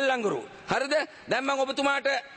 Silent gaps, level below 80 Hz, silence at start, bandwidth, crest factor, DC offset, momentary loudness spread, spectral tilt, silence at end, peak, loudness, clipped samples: none; -66 dBFS; 0 s; 8.8 kHz; 14 dB; under 0.1%; 5 LU; -3.5 dB/octave; 0 s; -12 dBFS; -27 LUFS; under 0.1%